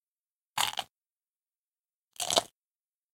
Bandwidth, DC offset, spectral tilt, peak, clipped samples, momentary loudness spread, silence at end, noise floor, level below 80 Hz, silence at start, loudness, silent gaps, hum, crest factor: 17 kHz; under 0.1%; 0 dB/octave; -6 dBFS; under 0.1%; 19 LU; 0.65 s; under -90 dBFS; -72 dBFS; 0.55 s; -31 LUFS; 0.90-0.95 s, 1.28-1.35 s, 1.58-1.62 s, 1.68-1.72 s, 1.96-2.08 s; none; 32 dB